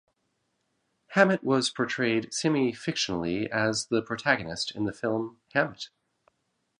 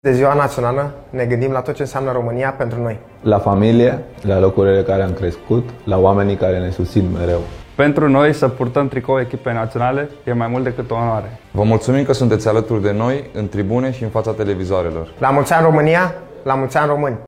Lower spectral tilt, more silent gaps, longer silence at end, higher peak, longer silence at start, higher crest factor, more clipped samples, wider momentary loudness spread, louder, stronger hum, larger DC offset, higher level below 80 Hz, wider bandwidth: second, -4 dB/octave vs -7.5 dB/octave; neither; first, 0.95 s vs 0 s; second, -4 dBFS vs 0 dBFS; first, 1.1 s vs 0.05 s; first, 24 dB vs 16 dB; neither; about the same, 8 LU vs 9 LU; second, -27 LUFS vs -17 LUFS; neither; neither; second, -62 dBFS vs -40 dBFS; second, 11 kHz vs 15 kHz